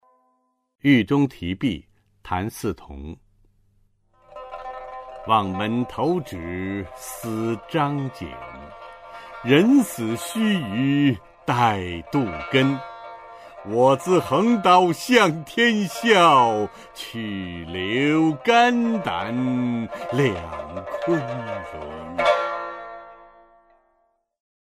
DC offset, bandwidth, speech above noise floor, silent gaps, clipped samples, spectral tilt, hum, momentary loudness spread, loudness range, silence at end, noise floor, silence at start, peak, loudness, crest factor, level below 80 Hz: under 0.1%; 15.5 kHz; 47 dB; none; under 0.1%; -5.5 dB/octave; none; 20 LU; 10 LU; 1.55 s; -68 dBFS; 0.85 s; -2 dBFS; -21 LUFS; 20 dB; -52 dBFS